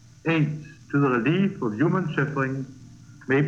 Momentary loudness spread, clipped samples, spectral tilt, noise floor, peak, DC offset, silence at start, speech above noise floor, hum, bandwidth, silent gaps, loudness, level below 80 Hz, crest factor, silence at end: 13 LU; under 0.1%; -8 dB/octave; -45 dBFS; -10 dBFS; under 0.1%; 0.25 s; 22 dB; none; 7.4 kHz; none; -24 LUFS; -62 dBFS; 14 dB; 0 s